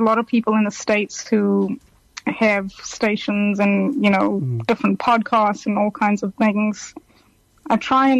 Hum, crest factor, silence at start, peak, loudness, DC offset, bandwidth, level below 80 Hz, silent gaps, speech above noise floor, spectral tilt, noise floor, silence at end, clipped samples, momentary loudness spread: none; 14 dB; 0 s; -6 dBFS; -19 LUFS; under 0.1%; 8.2 kHz; -58 dBFS; none; 37 dB; -5.5 dB/octave; -56 dBFS; 0 s; under 0.1%; 8 LU